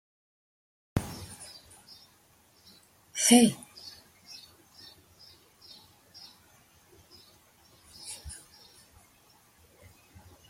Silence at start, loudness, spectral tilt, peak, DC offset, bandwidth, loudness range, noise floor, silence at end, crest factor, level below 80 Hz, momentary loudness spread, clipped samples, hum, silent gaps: 0.95 s; -27 LUFS; -3.5 dB/octave; -6 dBFS; under 0.1%; 16 kHz; 22 LU; -63 dBFS; 2.15 s; 28 dB; -60 dBFS; 32 LU; under 0.1%; none; none